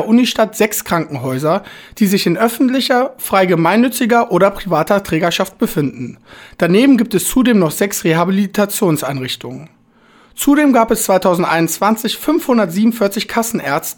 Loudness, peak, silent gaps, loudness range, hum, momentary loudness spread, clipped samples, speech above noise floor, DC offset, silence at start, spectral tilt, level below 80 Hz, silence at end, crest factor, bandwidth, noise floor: -14 LUFS; 0 dBFS; none; 2 LU; none; 8 LU; under 0.1%; 34 dB; under 0.1%; 0 s; -5 dB/octave; -44 dBFS; 0.05 s; 14 dB; over 20 kHz; -49 dBFS